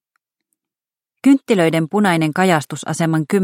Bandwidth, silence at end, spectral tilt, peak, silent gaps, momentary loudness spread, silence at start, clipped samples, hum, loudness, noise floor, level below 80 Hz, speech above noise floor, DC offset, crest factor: 16.5 kHz; 0 s; -6 dB/octave; 0 dBFS; none; 5 LU; 1.25 s; under 0.1%; none; -16 LUFS; under -90 dBFS; -66 dBFS; over 75 dB; under 0.1%; 16 dB